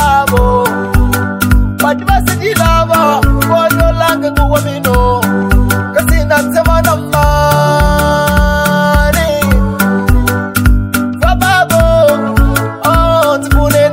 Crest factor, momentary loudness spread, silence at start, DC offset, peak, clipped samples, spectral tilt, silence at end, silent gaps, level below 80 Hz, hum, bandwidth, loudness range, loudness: 10 dB; 3 LU; 0 s; under 0.1%; 0 dBFS; 0.4%; -5.5 dB/octave; 0 s; none; -16 dBFS; none; 16.5 kHz; 1 LU; -10 LUFS